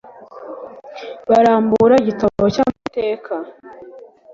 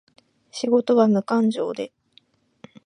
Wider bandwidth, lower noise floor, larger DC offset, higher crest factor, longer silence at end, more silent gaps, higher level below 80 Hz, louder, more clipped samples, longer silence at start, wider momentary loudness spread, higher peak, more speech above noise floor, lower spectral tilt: second, 7.6 kHz vs 10.5 kHz; second, -36 dBFS vs -59 dBFS; neither; about the same, 16 dB vs 18 dB; second, 0.35 s vs 1 s; neither; first, -50 dBFS vs -76 dBFS; first, -16 LUFS vs -21 LUFS; neither; second, 0.2 s vs 0.55 s; first, 21 LU vs 16 LU; about the same, -2 dBFS vs -4 dBFS; second, 20 dB vs 39 dB; about the same, -7 dB/octave vs -6.5 dB/octave